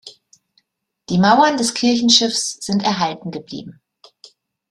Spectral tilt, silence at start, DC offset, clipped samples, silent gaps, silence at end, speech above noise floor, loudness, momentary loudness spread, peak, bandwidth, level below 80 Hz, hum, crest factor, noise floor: -3.5 dB/octave; 0.05 s; under 0.1%; under 0.1%; none; 1 s; 51 dB; -16 LUFS; 17 LU; 0 dBFS; 13 kHz; -60 dBFS; none; 20 dB; -68 dBFS